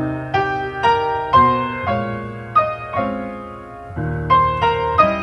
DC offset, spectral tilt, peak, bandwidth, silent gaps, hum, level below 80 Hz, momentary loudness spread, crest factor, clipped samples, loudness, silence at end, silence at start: under 0.1%; -7 dB/octave; 0 dBFS; 8.4 kHz; none; none; -40 dBFS; 14 LU; 18 dB; under 0.1%; -18 LUFS; 0 s; 0 s